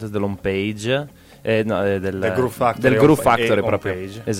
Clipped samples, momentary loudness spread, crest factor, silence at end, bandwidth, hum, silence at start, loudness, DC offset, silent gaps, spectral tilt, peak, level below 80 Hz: under 0.1%; 11 LU; 16 dB; 0 s; 16.5 kHz; none; 0 s; -19 LUFS; under 0.1%; none; -6 dB/octave; -2 dBFS; -48 dBFS